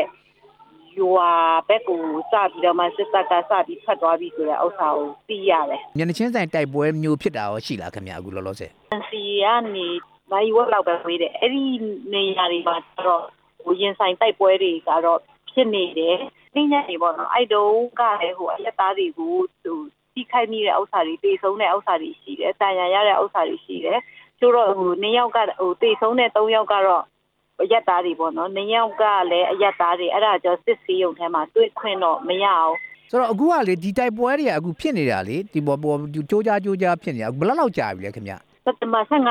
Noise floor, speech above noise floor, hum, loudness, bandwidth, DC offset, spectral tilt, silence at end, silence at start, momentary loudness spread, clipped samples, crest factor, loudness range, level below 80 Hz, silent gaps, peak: -53 dBFS; 33 dB; none; -21 LUFS; 13 kHz; under 0.1%; -6 dB/octave; 0 s; 0 s; 9 LU; under 0.1%; 16 dB; 3 LU; -64 dBFS; none; -4 dBFS